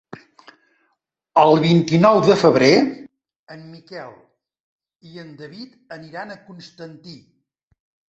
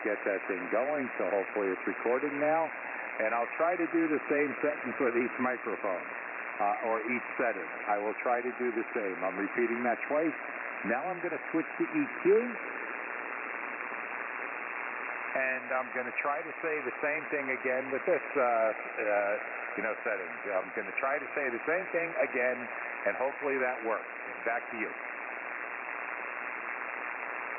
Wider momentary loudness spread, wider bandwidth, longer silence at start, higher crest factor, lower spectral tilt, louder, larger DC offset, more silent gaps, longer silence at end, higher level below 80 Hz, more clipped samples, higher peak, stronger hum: first, 25 LU vs 7 LU; first, 8 kHz vs 3 kHz; first, 1.35 s vs 0 s; about the same, 20 dB vs 16 dB; first, -6.5 dB/octave vs 1.5 dB/octave; first, -15 LUFS vs -32 LUFS; neither; first, 3.36-3.47 s, 4.60-4.79 s vs none; first, 0.95 s vs 0 s; first, -60 dBFS vs -84 dBFS; neither; first, 0 dBFS vs -16 dBFS; neither